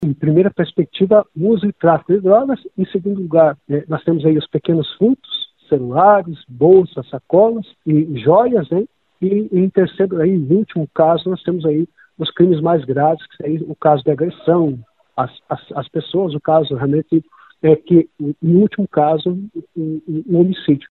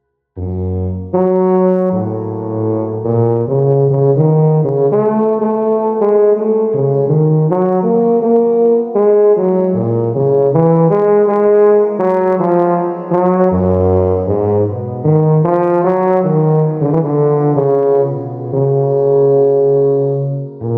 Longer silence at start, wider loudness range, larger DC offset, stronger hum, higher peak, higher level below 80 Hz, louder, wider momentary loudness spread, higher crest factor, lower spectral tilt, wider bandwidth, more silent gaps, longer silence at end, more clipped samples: second, 0 s vs 0.35 s; about the same, 4 LU vs 2 LU; neither; neither; about the same, 0 dBFS vs 0 dBFS; about the same, -56 dBFS vs -56 dBFS; second, -16 LUFS vs -13 LUFS; first, 11 LU vs 7 LU; about the same, 16 dB vs 12 dB; about the same, -11.5 dB/octave vs -12.5 dB/octave; first, 4.3 kHz vs 2.9 kHz; neither; about the same, 0.1 s vs 0 s; neither